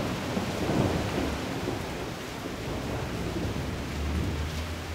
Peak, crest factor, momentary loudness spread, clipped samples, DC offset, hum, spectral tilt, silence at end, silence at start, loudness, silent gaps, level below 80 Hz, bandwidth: -12 dBFS; 18 dB; 7 LU; under 0.1%; under 0.1%; none; -5.5 dB/octave; 0 s; 0 s; -31 LUFS; none; -40 dBFS; 16 kHz